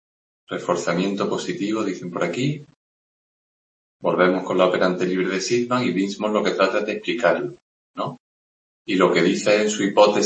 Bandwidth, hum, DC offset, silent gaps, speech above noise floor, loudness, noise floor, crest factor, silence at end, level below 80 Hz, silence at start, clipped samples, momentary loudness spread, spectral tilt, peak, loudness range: 8.8 kHz; none; under 0.1%; 2.76-4.00 s, 7.62-7.94 s, 8.20-8.85 s; over 70 dB; -21 LUFS; under -90 dBFS; 20 dB; 0 s; -66 dBFS; 0.5 s; under 0.1%; 12 LU; -5 dB/octave; -2 dBFS; 5 LU